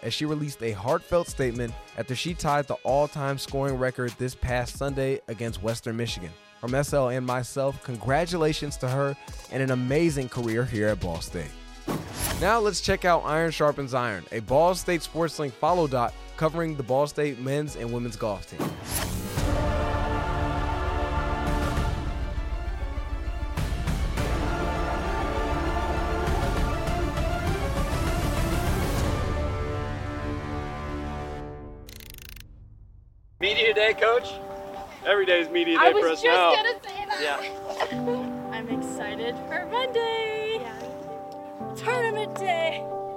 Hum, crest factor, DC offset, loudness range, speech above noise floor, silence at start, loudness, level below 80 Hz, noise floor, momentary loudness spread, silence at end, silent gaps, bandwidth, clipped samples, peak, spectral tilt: none; 22 dB; under 0.1%; 8 LU; 26 dB; 0 s; -27 LUFS; -36 dBFS; -51 dBFS; 12 LU; 0 s; none; 16.5 kHz; under 0.1%; -4 dBFS; -5 dB/octave